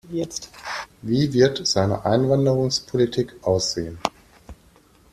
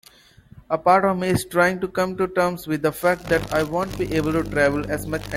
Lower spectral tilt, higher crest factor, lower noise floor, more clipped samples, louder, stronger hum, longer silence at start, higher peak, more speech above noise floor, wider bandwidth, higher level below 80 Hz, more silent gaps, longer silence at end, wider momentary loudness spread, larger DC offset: about the same, -5 dB/octave vs -5.5 dB/octave; about the same, 20 dB vs 18 dB; first, -54 dBFS vs -50 dBFS; neither; about the same, -22 LUFS vs -22 LUFS; neither; second, 0.05 s vs 0.55 s; about the same, -2 dBFS vs -4 dBFS; first, 33 dB vs 29 dB; second, 14 kHz vs 16.5 kHz; second, -50 dBFS vs -44 dBFS; neither; first, 0.6 s vs 0 s; first, 13 LU vs 7 LU; neither